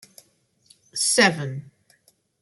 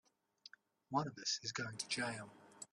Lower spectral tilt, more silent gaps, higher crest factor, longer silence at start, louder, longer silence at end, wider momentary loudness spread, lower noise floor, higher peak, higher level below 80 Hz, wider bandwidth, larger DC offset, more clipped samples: about the same, -2.5 dB/octave vs -2.5 dB/octave; neither; about the same, 22 dB vs 22 dB; first, 0.95 s vs 0.45 s; first, -21 LUFS vs -41 LUFS; first, 0.8 s vs 0.1 s; second, 17 LU vs 21 LU; about the same, -63 dBFS vs -66 dBFS; first, -4 dBFS vs -24 dBFS; first, -70 dBFS vs -82 dBFS; about the same, 12.5 kHz vs 13 kHz; neither; neither